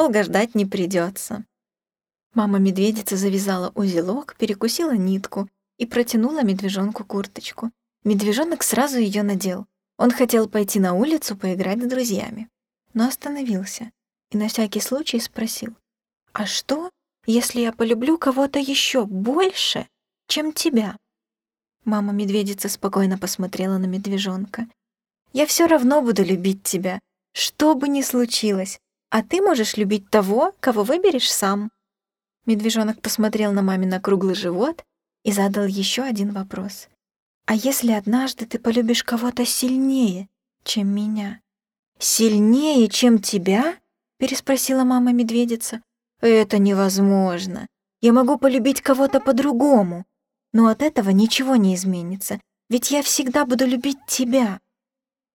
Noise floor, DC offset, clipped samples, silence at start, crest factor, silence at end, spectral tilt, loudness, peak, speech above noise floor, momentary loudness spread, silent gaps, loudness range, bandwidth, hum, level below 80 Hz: under -90 dBFS; under 0.1%; under 0.1%; 0 s; 18 dB; 0.75 s; -4.5 dB/octave; -20 LUFS; -4 dBFS; over 70 dB; 13 LU; 2.26-2.30 s, 37.16-37.41 s, 41.79-41.92 s; 6 LU; 18 kHz; none; -62 dBFS